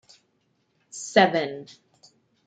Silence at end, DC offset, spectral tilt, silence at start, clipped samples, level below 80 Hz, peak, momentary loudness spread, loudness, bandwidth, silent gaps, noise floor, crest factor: 0.85 s; under 0.1%; -4 dB/octave; 0.95 s; under 0.1%; -78 dBFS; -4 dBFS; 21 LU; -22 LUFS; 9.6 kHz; none; -70 dBFS; 24 dB